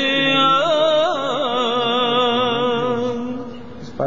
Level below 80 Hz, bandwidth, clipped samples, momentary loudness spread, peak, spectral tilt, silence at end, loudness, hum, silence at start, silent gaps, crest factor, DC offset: -56 dBFS; 7.6 kHz; under 0.1%; 15 LU; -6 dBFS; -4.5 dB/octave; 0 s; -17 LUFS; none; 0 s; none; 12 dB; 1%